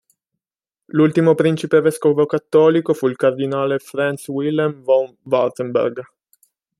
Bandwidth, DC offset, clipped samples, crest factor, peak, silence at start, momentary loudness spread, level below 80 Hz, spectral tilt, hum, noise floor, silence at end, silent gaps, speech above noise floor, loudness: 13 kHz; under 0.1%; under 0.1%; 16 dB; -2 dBFS; 0.95 s; 7 LU; -66 dBFS; -7 dB/octave; none; -88 dBFS; 0.75 s; none; 71 dB; -18 LUFS